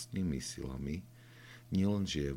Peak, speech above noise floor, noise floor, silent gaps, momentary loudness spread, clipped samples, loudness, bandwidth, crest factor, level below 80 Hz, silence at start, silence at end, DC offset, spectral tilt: -22 dBFS; 20 dB; -55 dBFS; none; 21 LU; under 0.1%; -37 LUFS; 16 kHz; 16 dB; -52 dBFS; 0 s; 0 s; under 0.1%; -5.5 dB/octave